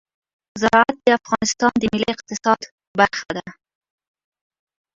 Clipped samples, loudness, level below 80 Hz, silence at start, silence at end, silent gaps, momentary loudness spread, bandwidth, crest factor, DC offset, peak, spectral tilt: under 0.1%; -19 LUFS; -52 dBFS; 0.55 s; 1.45 s; 2.72-2.78 s, 2.87-2.94 s; 12 LU; 7.8 kHz; 20 dB; under 0.1%; 0 dBFS; -3.5 dB/octave